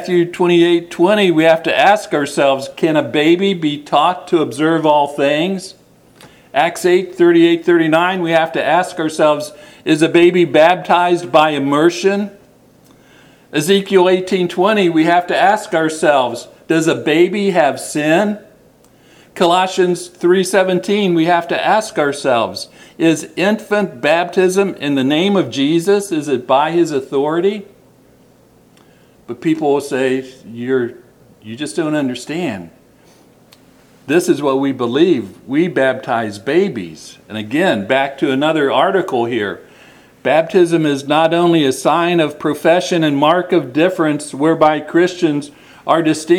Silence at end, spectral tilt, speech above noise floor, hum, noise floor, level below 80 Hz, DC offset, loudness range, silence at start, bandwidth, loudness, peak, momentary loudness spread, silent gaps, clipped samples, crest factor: 0 s; -5 dB/octave; 34 dB; none; -48 dBFS; -62 dBFS; under 0.1%; 6 LU; 0 s; 14.5 kHz; -14 LUFS; 0 dBFS; 9 LU; none; under 0.1%; 14 dB